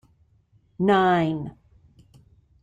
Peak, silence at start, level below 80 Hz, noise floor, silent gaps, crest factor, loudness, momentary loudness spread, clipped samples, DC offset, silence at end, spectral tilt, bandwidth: -8 dBFS; 0.8 s; -58 dBFS; -61 dBFS; none; 18 dB; -22 LUFS; 15 LU; under 0.1%; under 0.1%; 1.15 s; -7.5 dB/octave; 8.8 kHz